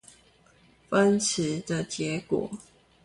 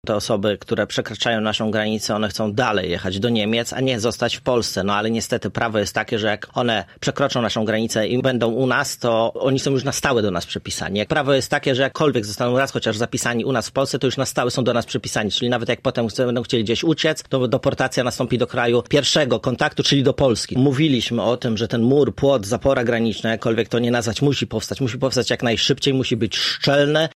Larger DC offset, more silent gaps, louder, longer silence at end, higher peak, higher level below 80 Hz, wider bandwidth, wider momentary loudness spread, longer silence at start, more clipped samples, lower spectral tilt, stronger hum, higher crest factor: neither; neither; second, -27 LUFS vs -20 LUFS; first, 0.45 s vs 0.05 s; second, -10 dBFS vs -2 dBFS; second, -62 dBFS vs -48 dBFS; second, 11.5 kHz vs 15.5 kHz; first, 9 LU vs 5 LU; first, 0.9 s vs 0.05 s; neither; about the same, -4.5 dB/octave vs -4.5 dB/octave; neither; about the same, 18 dB vs 16 dB